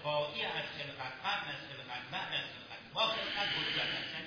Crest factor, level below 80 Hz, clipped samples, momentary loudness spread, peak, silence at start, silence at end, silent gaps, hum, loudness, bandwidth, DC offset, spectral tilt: 18 dB; -70 dBFS; under 0.1%; 11 LU; -20 dBFS; 0 s; 0 s; none; none; -36 LUFS; 5.4 kHz; under 0.1%; -3.5 dB/octave